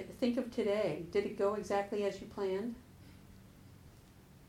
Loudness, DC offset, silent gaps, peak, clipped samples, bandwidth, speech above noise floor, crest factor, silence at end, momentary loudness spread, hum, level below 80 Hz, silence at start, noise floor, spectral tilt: -36 LUFS; under 0.1%; none; -20 dBFS; under 0.1%; 16 kHz; 23 dB; 16 dB; 0.05 s; 23 LU; none; -64 dBFS; 0 s; -59 dBFS; -6 dB/octave